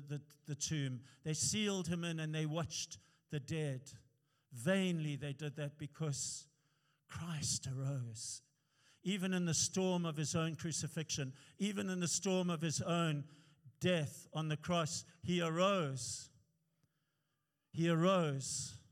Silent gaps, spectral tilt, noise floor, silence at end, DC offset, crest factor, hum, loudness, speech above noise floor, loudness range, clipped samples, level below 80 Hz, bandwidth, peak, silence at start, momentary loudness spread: none; -4.5 dB/octave; -86 dBFS; 0.15 s; under 0.1%; 18 dB; none; -39 LUFS; 47 dB; 4 LU; under 0.1%; -76 dBFS; 15.5 kHz; -22 dBFS; 0 s; 13 LU